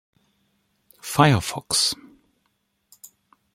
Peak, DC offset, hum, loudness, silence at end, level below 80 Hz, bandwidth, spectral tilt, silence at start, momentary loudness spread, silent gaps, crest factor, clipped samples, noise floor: -2 dBFS; under 0.1%; none; -20 LUFS; 0.5 s; -56 dBFS; 16.5 kHz; -4 dB/octave; 1.05 s; 16 LU; none; 24 dB; under 0.1%; -72 dBFS